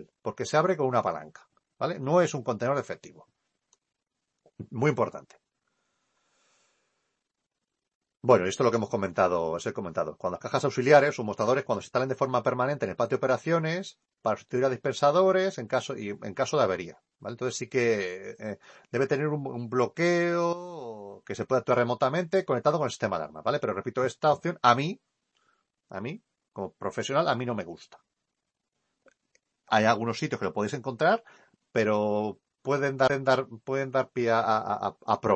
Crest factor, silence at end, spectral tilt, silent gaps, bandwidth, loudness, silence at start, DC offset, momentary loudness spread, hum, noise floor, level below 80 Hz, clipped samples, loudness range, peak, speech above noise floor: 22 dB; 0 s; -5.5 dB/octave; 7.95-8.01 s; 8.8 kHz; -27 LUFS; 0 s; under 0.1%; 15 LU; none; -85 dBFS; -70 dBFS; under 0.1%; 7 LU; -6 dBFS; 58 dB